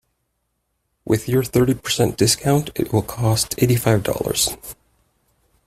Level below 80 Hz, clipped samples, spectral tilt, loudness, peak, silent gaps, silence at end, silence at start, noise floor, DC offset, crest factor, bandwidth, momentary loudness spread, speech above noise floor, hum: -44 dBFS; under 0.1%; -4.5 dB/octave; -19 LUFS; -2 dBFS; none; 0.95 s; 1.05 s; -72 dBFS; under 0.1%; 18 dB; 16 kHz; 5 LU; 53 dB; none